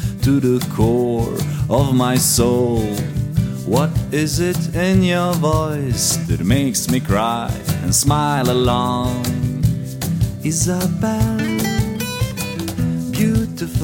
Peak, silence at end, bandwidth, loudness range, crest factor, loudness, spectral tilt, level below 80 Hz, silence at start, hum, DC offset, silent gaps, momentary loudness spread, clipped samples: -2 dBFS; 0 s; 17 kHz; 3 LU; 14 dB; -18 LUFS; -5 dB/octave; -32 dBFS; 0 s; none; under 0.1%; none; 7 LU; under 0.1%